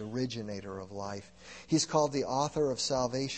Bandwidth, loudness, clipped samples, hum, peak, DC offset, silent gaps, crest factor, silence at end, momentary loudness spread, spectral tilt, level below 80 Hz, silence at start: 8.8 kHz; -32 LUFS; under 0.1%; none; -14 dBFS; under 0.1%; none; 20 dB; 0 s; 14 LU; -4.5 dB/octave; -62 dBFS; 0 s